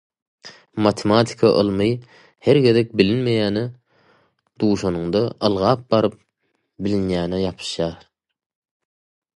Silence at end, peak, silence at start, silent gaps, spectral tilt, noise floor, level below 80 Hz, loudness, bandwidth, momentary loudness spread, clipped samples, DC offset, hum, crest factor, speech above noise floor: 1.4 s; -2 dBFS; 0.45 s; none; -6.5 dB/octave; -71 dBFS; -48 dBFS; -20 LUFS; 11.5 kHz; 9 LU; under 0.1%; under 0.1%; none; 20 dB; 53 dB